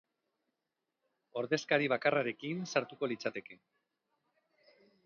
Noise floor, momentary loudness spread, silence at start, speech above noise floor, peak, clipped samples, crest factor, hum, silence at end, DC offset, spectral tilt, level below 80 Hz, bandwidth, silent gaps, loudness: -88 dBFS; 10 LU; 1.35 s; 53 dB; -14 dBFS; under 0.1%; 22 dB; none; 1.5 s; under 0.1%; -3.5 dB/octave; -86 dBFS; 7 kHz; none; -34 LUFS